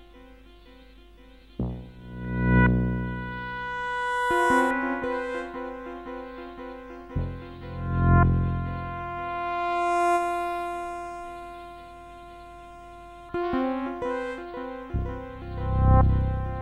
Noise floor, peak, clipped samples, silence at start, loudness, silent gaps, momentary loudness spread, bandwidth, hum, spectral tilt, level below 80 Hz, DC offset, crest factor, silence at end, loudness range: -51 dBFS; -8 dBFS; under 0.1%; 0 s; -27 LUFS; none; 21 LU; 12.5 kHz; none; -7.5 dB/octave; -34 dBFS; under 0.1%; 18 dB; 0 s; 8 LU